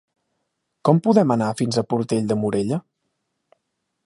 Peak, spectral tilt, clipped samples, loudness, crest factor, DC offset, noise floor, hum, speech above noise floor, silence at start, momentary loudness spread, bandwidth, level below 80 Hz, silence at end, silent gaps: -2 dBFS; -7 dB/octave; under 0.1%; -21 LUFS; 20 dB; under 0.1%; -76 dBFS; none; 57 dB; 0.85 s; 8 LU; 11.5 kHz; -62 dBFS; 1.25 s; none